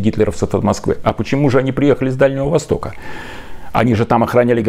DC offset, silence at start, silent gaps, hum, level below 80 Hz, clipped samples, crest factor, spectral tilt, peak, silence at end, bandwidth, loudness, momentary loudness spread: under 0.1%; 0 s; none; none; -36 dBFS; under 0.1%; 14 dB; -7 dB/octave; 0 dBFS; 0 s; 15 kHz; -16 LUFS; 16 LU